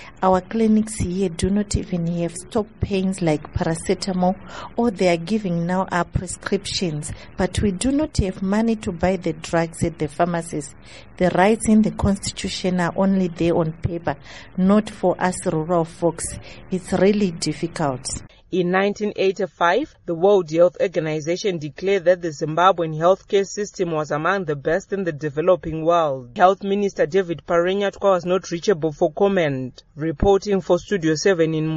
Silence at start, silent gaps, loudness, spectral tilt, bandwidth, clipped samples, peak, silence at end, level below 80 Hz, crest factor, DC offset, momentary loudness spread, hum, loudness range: 0 s; none; -21 LUFS; -5.5 dB/octave; 11.5 kHz; under 0.1%; -2 dBFS; 0 s; -40 dBFS; 18 dB; under 0.1%; 9 LU; none; 3 LU